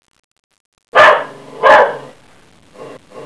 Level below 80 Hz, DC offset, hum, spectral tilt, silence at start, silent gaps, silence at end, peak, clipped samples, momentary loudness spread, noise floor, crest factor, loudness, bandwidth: -58 dBFS; 0.3%; none; -3 dB/octave; 0.95 s; none; 0 s; 0 dBFS; 0.4%; 18 LU; -47 dBFS; 14 dB; -10 LUFS; 11 kHz